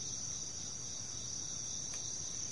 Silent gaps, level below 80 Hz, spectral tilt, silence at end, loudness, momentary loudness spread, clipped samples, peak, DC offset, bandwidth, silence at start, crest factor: none; -64 dBFS; -1 dB/octave; 0 s; -40 LUFS; 2 LU; under 0.1%; -28 dBFS; 0.3%; 11.5 kHz; 0 s; 14 dB